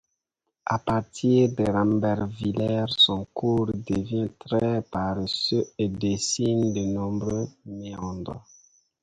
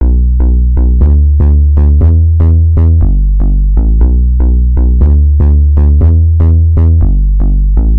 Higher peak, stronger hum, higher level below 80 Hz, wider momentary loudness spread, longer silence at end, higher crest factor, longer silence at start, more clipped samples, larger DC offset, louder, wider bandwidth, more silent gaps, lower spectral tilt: second, -8 dBFS vs 0 dBFS; neither; second, -50 dBFS vs -6 dBFS; first, 13 LU vs 4 LU; first, 0.65 s vs 0 s; first, 16 dB vs 6 dB; first, 0.65 s vs 0 s; second, under 0.1% vs 1%; second, under 0.1% vs 1%; second, -25 LUFS vs -9 LUFS; first, 9.6 kHz vs 1.8 kHz; neither; second, -5 dB/octave vs -13.5 dB/octave